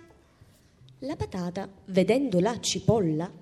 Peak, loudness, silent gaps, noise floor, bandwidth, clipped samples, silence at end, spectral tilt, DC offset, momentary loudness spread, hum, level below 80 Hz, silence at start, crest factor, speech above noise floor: -10 dBFS; -27 LUFS; none; -58 dBFS; 12.5 kHz; under 0.1%; 0.05 s; -5.5 dB/octave; under 0.1%; 13 LU; none; -54 dBFS; 1 s; 18 dB; 31 dB